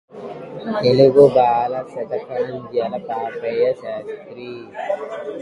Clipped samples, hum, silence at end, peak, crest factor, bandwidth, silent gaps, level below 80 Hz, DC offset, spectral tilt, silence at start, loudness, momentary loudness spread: under 0.1%; none; 0 s; 0 dBFS; 18 dB; 10.5 kHz; none; -60 dBFS; under 0.1%; -7.5 dB/octave; 0.15 s; -18 LUFS; 21 LU